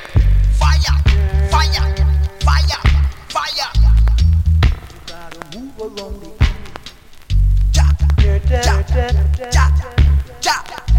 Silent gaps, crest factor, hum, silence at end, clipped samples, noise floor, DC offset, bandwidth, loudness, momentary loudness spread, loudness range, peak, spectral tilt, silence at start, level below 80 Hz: none; 14 dB; none; 0 s; under 0.1%; -36 dBFS; under 0.1%; 11 kHz; -15 LUFS; 16 LU; 5 LU; 0 dBFS; -5 dB/octave; 0 s; -16 dBFS